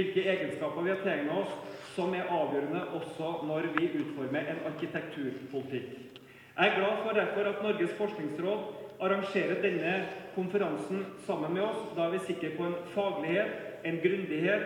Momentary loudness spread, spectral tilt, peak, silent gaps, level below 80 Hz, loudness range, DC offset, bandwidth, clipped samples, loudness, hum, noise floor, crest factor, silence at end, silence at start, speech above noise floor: 8 LU; -6.5 dB/octave; -10 dBFS; none; -76 dBFS; 3 LU; under 0.1%; 16.5 kHz; under 0.1%; -33 LUFS; none; -52 dBFS; 22 dB; 0 s; 0 s; 20 dB